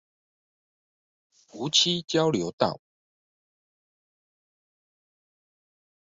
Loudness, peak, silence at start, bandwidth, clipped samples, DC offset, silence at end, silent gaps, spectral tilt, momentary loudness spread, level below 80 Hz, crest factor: -24 LUFS; -8 dBFS; 1.55 s; 8 kHz; under 0.1%; under 0.1%; 3.35 s; 2.53-2.58 s; -3.5 dB/octave; 11 LU; -68 dBFS; 24 dB